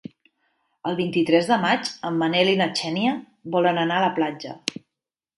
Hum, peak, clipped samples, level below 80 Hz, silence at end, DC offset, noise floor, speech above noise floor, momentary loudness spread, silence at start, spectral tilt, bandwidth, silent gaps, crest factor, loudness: none; -4 dBFS; under 0.1%; -70 dBFS; 0.65 s; under 0.1%; -86 dBFS; 64 dB; 11 LU; 0.85 s; -5 dB/octave; 11.5 kHz; none; 20 dB; -23 LUFS